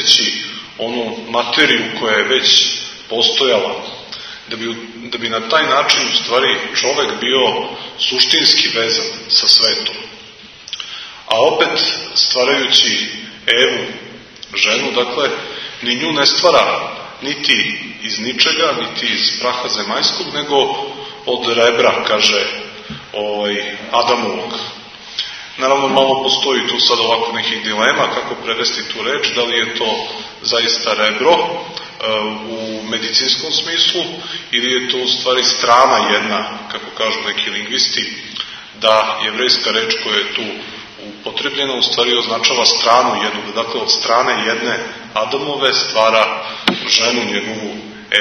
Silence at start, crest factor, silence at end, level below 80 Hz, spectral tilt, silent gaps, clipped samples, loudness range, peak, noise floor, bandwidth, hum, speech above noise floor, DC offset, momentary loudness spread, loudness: 0 s; 16 dB; 0 s; -58 dBFS; -1.5 dB/octave; none; under 0.1%; 3 LU; 0 dBFS; -38 dBFS; 12 kHz; none; 22 dB; under 0.1%; 14 LU; -14 LUFS